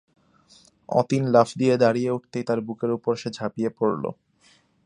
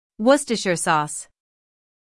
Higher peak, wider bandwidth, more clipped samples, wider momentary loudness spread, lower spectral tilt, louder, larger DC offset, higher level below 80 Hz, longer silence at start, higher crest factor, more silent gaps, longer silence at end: about the same, -2 dBFS vs -2 dBFS; second, 10.5 kHz vs 12 kHz; neither; about the same, 9 LU vs 10 LU; first, -7 dB/octave vs -3.5 dB/octave; second, -24 LUFS vs -20 LUFS; neither; about the same, -66 dBFS vs -62 dBFS; first, 0.9 s vs 0.2 s; about the same, 22 dB vs 20 dB; neither; about the same, 0.75 s vs 0.85 s